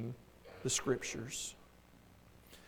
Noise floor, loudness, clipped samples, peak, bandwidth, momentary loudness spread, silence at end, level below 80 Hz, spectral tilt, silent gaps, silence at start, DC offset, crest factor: -62 dBFS; -39 LUFS; under 0.1%; -22 dBFS; over 20 kHz; 23 LU; 0 s; -64 dBFS; -3 dB/octave; none; 0 s; under 0.1%; 22 dB